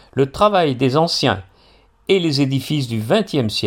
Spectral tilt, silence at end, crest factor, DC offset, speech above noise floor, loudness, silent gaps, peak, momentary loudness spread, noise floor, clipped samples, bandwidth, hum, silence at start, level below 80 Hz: -5.5 dB/octave; 0 s; 16 dB; under 0.1%; 35 dB; -18 LUFS; none; -2 dBFS; 6 LU; -52 dBFS; under 0.1%; 16.5 kHz; none; 0.15 s; -50 dBFS